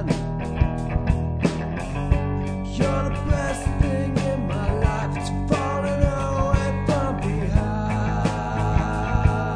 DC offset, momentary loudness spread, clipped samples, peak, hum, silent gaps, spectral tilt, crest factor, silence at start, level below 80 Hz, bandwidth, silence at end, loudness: under 0.1%; 4 LU; under 0.1%; -4 dBFS; none; none; -7 dB/octave; 18 dB; 0 s; -28 dBFS; 10.5 kHz; 0 s; -24 LUFS